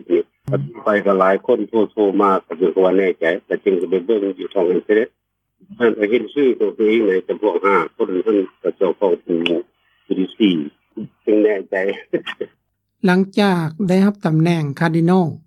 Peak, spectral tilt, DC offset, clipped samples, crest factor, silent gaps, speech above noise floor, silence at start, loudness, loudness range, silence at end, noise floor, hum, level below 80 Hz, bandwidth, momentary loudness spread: 0 dBFS; -8 dB/octave; under 0.1%; under 0.1%; 18 dB; none; 40 dB; 0.1 s; -18 LUFS; 3 LU; 0.1 s; -57 dBFS; none; -66 dBFS; 12 kHz; 9 LU